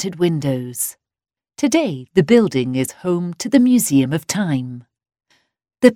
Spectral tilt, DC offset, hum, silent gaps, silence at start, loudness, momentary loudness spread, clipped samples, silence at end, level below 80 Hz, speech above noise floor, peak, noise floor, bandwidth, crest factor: -5.5 dB/octave; under 0.1%; none; none; 0 s; -18 LUFS; 10 LU; under 0.1%; 0 s; -58 dBFS; over 73 dB; 0 dBFS; under -90 dBFS; 16.5 kHz; 18 dB